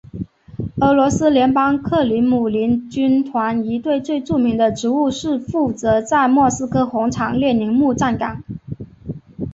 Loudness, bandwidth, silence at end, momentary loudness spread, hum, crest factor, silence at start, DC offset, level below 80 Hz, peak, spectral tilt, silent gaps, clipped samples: -17 LUFS; 8 kHz; 0 s; 17 LU; none; 16 dB; 0.15 s; under 0.1%; -44 dBFS; 0 dBFS; -6 dB/octave; none; under 0.1%